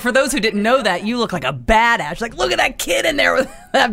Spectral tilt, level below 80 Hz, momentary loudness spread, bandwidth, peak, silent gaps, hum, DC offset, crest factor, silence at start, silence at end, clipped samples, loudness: -3 dB/octave; -36 dBFS; 6 LU; 16 kHz; -2 dBFS; none; none; under 0.1%; 16 dB; 0 s; 0 s; under 0.1%; -17 LUFS